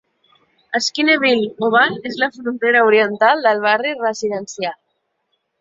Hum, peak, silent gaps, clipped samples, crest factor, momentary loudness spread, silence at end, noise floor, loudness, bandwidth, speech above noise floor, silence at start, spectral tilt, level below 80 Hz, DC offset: none; -2 dBFS; none; under 0.1%; 16 dB; 10 LU; 0.85 s; -70 dBFS; -16 LUFS; 7.8 kHz; 54 dB; 0.7 s; -3 dB/octave; -66 dBFS; under 0.1%